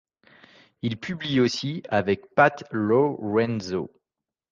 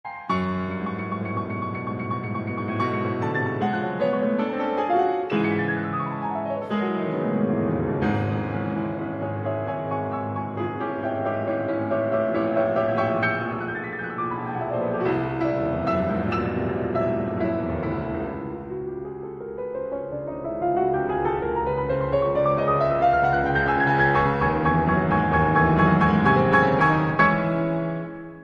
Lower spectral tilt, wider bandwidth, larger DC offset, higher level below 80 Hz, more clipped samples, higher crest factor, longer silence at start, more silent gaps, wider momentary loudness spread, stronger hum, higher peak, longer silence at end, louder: second, -6 dB/octave vs -9 dB/octave; first, 7.6 kHz vs 6.8 kHz; neither; second, -58 dBFS vs -44 dBFS; neither; about the same, 20 dB vs 18 dB; first, 0.85 s vs 0.05 s; neither; about the same, 11 LU vs 10 LU; neither; about the same, -4 dBFS vs -6 dBFS; first, 0.65 s vs 0 s; about the same, -24 LUFS vs -24 LUFS